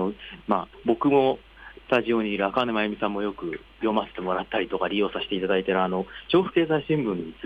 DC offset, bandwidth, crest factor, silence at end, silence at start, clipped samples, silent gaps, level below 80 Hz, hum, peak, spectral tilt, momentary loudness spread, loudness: under 0.1%; 6.2 kHz; 18 dB; 0 s; 0 s; under 0.1%; none; -54 dBFS; none; -8 dBFS; -8 dB/octave; 9 LU; -25 LUFS